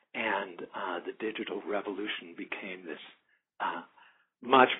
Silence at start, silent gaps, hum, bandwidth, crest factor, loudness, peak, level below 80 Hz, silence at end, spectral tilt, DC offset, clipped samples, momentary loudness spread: 0.15 s; none; none; 3.9 kHz; 26 dB; -34 LUFS; -6 dBFS; -82 dBFS; 0 s; 1.5 dB/octave; under 0.1%; under 0.1%; 12 LU